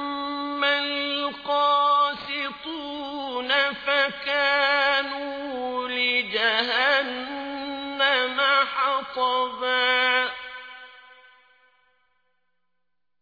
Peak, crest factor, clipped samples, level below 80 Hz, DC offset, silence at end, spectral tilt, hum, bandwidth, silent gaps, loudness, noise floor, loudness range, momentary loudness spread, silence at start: -8 dBFS; 18 dB; under 0.1%; -66 dBFS; under 0.1%; 2.1 s; -3 dB/octave; 60 Hz at -80 dBFS; 5 kHz; none; -23 LUFS; -84 dBFS; 3 LU; 12 LU; 0 s